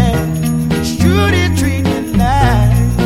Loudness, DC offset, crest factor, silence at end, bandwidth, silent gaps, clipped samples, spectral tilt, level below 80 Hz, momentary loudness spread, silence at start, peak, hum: -13 LUFS; 0.8%; 12 dB; 0 s; 16.5 kHz; none; under 0.1%; -6 dB/octave; -22 dBFS; 5 LU; 0 s; 0 dBFS; none